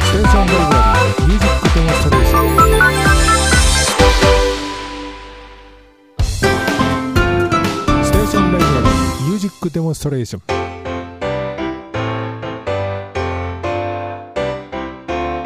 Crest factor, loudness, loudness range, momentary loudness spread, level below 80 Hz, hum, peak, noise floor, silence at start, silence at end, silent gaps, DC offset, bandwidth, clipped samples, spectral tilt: 14 dB; -15 LUFS; 10 LU; 14 LU; -20 dBFS; none; 0 dBFS; -44 dBFS; 0 s; 0 s; none; under 0.1%; 15.5 kHz; under 0.1%; -4.5 dB/octave